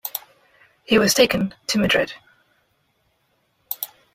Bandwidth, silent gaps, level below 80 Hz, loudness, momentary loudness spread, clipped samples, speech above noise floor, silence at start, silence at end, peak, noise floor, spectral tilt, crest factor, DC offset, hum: 16 kHz; none; -54 dBFS; -20 LUFS; 16 LU; under 0.1%; 48 dB; 0.05 s; 0.3 s; -2 dBFS; -67 dBFS; -3.5 dB/octave; 20 dB; under 0.1%; none